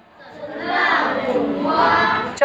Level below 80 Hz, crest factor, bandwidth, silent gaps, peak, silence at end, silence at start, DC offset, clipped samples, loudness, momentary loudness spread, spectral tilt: -56 dBFS; 16 dB; 8.6 kHz; none; -4 dBFS; 0 s; 0.2 s; under 0.1%; under 0.1%; -18 LUFS; 14 LU; -4.5 dB/octave